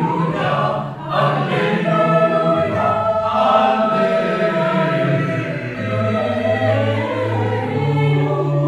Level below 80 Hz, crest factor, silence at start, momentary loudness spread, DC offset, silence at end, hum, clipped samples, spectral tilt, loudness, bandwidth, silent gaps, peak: -52 dBFS; 14 dB; 0 s; 6 LU; under 0.1%; 0 s; none; under 0.1%; -8 dB/octave; -17 LUFS; 10 kHz; none; -2 dBFS